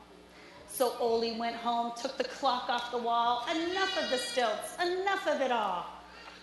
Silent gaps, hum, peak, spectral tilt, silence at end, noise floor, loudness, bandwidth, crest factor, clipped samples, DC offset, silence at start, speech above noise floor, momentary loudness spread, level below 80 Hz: none; none; -14 dBFS; -2.5 dB/octave; 0 s; -53 dBFS; -31 LUFS; 12 kHz; 18 dB; under 0.1%; under 0.1%; 0 s; 22 dB; 7 LU; -68 dBFS